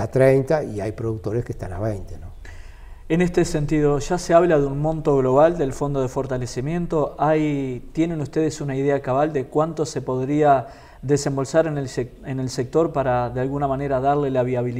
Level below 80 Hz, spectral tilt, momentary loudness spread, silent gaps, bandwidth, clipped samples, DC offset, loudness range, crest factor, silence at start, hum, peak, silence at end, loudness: -40 dBFS; -7 dB/octave; 11 LU; none; 15 kHz; under 0.1%; under 0.1%; 4 LU; 18 dB; 0 s; none; -2 dBFS; 0 s; -21 LUFS